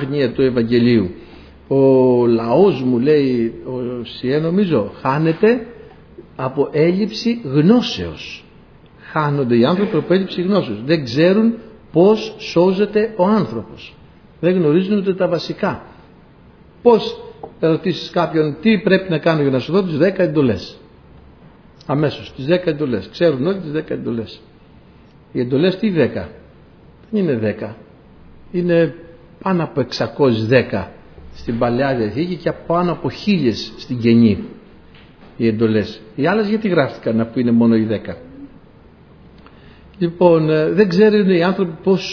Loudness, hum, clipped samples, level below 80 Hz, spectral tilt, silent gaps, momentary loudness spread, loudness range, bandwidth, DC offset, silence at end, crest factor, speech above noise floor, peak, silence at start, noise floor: -17 LUFS; none; under 0.1%; -48 dBFS; -8 dB/octave; none; 12 LU; 5 LU; 5.4 kHz; under 0.1%; 0 s; 18 dB; 29 dB; 0 dBFS; 0 s; -45 dBFS